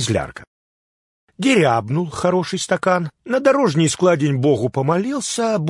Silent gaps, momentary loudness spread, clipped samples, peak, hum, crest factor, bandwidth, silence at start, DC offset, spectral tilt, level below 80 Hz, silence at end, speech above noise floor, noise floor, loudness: 0.47-1.28 s; 6 LU; under 0.1%; -2 dBFS; none; 16 dB; 11.5 kHz; 0 s; under 0.1%; -5 dB/octave; -54 dBFS; 0 s; over 72 dB; under -90 dBFS; -18 LUFS